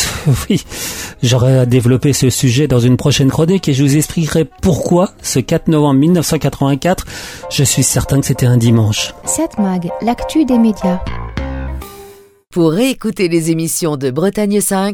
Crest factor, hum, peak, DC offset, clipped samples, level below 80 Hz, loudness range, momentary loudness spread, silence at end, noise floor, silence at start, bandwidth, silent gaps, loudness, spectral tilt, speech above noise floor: 14 dB; none; 0 dBFS; under 0.1%; under 0.1%; -32 dBFS; 5 LU; 10 LU; 0 s; -40 dBFS; 0 s; 18.5 kHz; none; -13 LUFS; -5.5 dB/octave; 27 dB